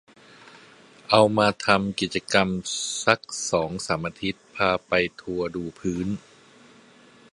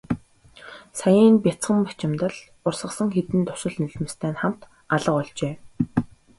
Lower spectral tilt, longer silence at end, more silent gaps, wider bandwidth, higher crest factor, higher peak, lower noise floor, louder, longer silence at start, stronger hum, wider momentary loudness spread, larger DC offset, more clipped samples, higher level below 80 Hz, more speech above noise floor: second, -4 dB/octave vs -6.5 dB/octave; first, 1.15 s vs 0.35 s; neither; about the same, 11.5 kHz vs 11.5 kHz; first, 24 dB vs 18 dB; first, 0 dBFS vs -6 dBFS; first, -53 dBFS vs -49 dBFS; about the same, -24 LUFS vs -23 LUFS; first, 1.1 s vs 0.1 s; neither; second, 11 LU vs 14 LU; neither; neither; about the same, -54 dBFS vs -54 dBFS; about the same, 29 dB vs 27 dB